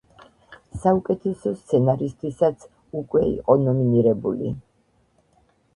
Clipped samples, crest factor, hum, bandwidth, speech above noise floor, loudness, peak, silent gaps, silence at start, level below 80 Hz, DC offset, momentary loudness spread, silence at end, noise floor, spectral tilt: under 0.1%; 20 dB; none; 11 kHz; 43 dB; -22 LUFS; -2 dBFS; none; 0.5 s; -50 dBFS; under 0.1%; 14 LU; 1.15 s; -64 dBFS; -9.5 dB/octave